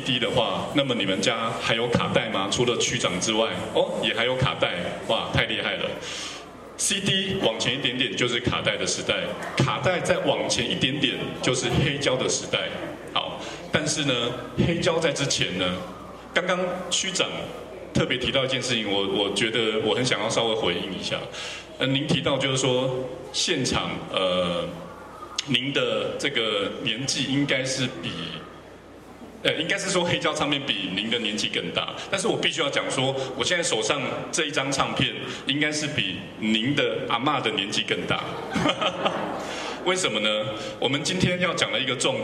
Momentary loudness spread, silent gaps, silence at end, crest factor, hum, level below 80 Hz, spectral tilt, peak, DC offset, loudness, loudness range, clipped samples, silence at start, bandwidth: 7 LU; none; 0 s; 20 dB; none; -52 dBFS; -3.5 dB/octave; -6 dBFS; under 0.1%; -24 LUFS; 2 LU; under 0.1%; 0 s; 13.5 kHz